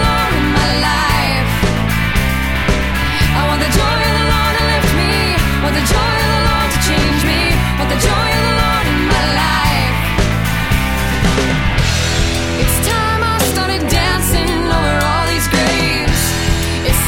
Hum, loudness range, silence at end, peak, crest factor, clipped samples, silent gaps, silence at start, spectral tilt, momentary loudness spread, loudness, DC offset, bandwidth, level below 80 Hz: none; 1 LU; 0 s; -2 dBFS; 12 dB; under 0.1%; none; 0 s; -4 dB/octave; 2 LU; -14 LUFS; under 0.1%; 17 kHz; -20 dBFS